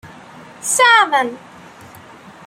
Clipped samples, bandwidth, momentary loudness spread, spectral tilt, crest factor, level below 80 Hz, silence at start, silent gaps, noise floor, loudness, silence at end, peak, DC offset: under 0.1%; 16 kHz; 16 LU; 0 dB/octave; 18 dB; -64 dBFS; 0.05 s; none; -40 dBFS; -13 LUFS; 1.1 s; 0 dBFS; under 0.1%